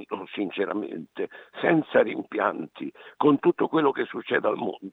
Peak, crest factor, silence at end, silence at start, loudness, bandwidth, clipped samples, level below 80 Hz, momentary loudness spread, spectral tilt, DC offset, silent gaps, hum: -6 dBFS; 20 dB; 0 s; 0 s; -26 LUFS; 4.1 kHz; under 0.1%; -82 dBFS; 14 LU; -8.5 dB/octave; under 0.1%; none; none